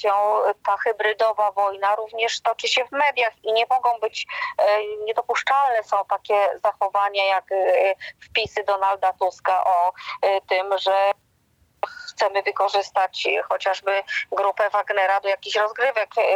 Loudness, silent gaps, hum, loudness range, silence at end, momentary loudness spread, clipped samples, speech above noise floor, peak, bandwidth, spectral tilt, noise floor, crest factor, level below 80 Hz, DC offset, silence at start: -22 LUFS; none; none; 2 LU; 0 s; 5 LU; under 0.1%; 41 dB; -8 dBFS; 16 kHz; -1 dB/octave; -63 dBFS; 14 dB; -70 dBFS; under 0.1%; 0 s